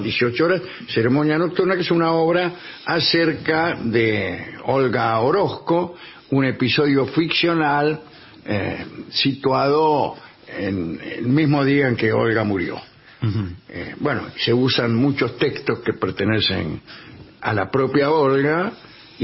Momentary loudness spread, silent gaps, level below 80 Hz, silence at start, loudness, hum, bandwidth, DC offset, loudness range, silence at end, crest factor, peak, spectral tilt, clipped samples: 11 LU; none; -54 dBFS; 0 s; -20 LUFS; none; 5.8 kHz; under 0.1%; 2 LU; 0 s; 14 dB; -6 dBFS; -9.5 dB/octave; under 0.1%